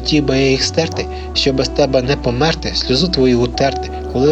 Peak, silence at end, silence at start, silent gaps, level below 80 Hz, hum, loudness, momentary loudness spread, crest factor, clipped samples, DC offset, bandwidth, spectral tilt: -2 dBFS; 0 s; 0 s; none; -28 dBFS; none; -15 LUFS; 6 LU; 14 dB; under 0.1%; under 0.1%; 8.8 kHz; -5 dB/octave